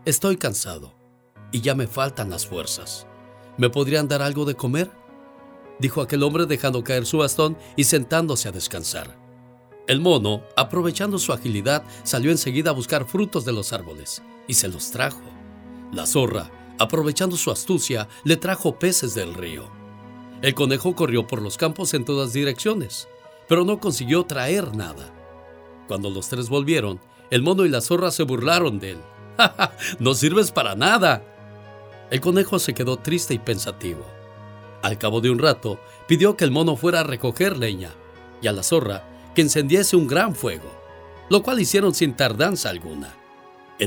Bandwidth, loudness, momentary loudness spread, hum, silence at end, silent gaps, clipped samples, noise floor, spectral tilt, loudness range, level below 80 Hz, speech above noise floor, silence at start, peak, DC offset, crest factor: over 20 kHz; -21 LUFS; 15 LU; none; 0 s; none; under 0.1%; -50 dBFS; -4 dB/octave; 4 LU; -54 dBFS; 28 dB; 0.05 s; 0 dBFS; under 0.1%; 22 dB